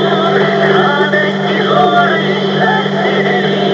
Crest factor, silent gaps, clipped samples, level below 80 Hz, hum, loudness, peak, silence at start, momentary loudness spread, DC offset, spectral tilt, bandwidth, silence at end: 10 dB; none; under 0.1%; -60 dBFS; 50 Hz at -25 dBFS; -11 LUFS; 0 dBFS; 0 s; 3 LU; under 0.1%; -6 dB/octave; 7.6 kHz; 0 s